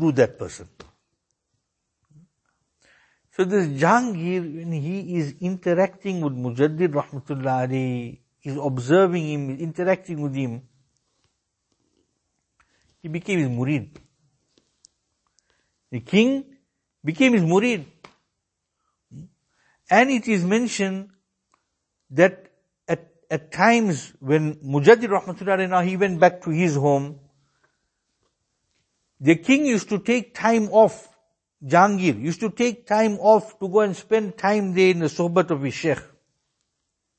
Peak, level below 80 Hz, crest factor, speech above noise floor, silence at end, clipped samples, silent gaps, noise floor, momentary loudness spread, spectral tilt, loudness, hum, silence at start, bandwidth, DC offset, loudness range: 0 dBFS; -66 dBFS; 22 dB; 58 dB; 1.15 s; under 0.1%; none; -79 dBFS; 12 LU; -6 dB/octave; -21 LUFS; none; 0 s; 8.8 kHz; under 0.1%; 10 LU